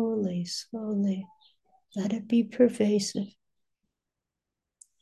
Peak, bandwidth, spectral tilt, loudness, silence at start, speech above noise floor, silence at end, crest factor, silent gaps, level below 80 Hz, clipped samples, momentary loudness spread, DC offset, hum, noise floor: -10 dBFS; 12.5 kHz; -6 dB/octave; -28 LUFS; 0 s; 60 dB; 1.7 s; 20 dB; none; -74 dBFS; under 0.1%; 13 LU; under 0.1%; none; -87 dBFS